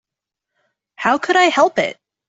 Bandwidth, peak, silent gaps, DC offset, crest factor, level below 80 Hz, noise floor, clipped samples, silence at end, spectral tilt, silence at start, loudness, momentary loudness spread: 8 kHz; -2 dBFS; none; under 0.1%; 16 dB; -64 dBFS; -84 dBFS; under 0.1%; 0.35 s; -3 dB/octave; 1 s; -16 LUFS; 9 LU